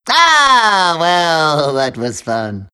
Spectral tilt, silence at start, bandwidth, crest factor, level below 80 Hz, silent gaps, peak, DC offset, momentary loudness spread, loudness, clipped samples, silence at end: -3 dB/octave; 0.05 s; 12.5 kHz; 12 dB; -52 dBFS; none; 0 dBFS; under 0.1%; 12 LU; -12 LUFS; under 0.1%; 0.1 s